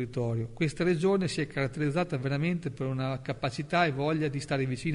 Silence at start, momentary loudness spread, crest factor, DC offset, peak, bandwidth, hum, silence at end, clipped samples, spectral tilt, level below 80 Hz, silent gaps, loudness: 0 s; 6 LU; 16 dB; under 0.1%; -12 dBFS; 10.5 kHz; none; 0 s; under 0.1%; -6.5 dB/octave; -54 dBFS; none; -30 LUFS